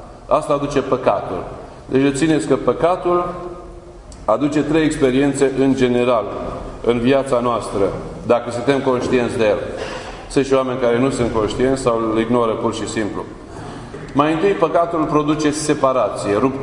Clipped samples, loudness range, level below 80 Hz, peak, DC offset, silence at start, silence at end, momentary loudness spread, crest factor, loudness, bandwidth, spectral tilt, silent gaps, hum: under 0.1%; 2 LU; -40 dBFS; 0 dBFS; under 0.1%; 0 s; 0 s; 12 LU; 18 dB; -18 LUFS; 11 kHz; -5.5 dB/octave; none; none